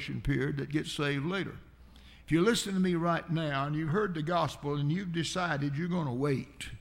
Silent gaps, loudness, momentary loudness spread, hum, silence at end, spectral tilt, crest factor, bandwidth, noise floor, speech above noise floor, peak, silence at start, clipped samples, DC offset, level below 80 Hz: none; -31 LUFS; 6 LU; none; 0 s; -5.5 dB/octave; 18 dB; 16.5 kHz; -54 dBFS; 23 dB; -14 dBFS; 0 s; under 0.1%; under 0.1%; -52 dBFS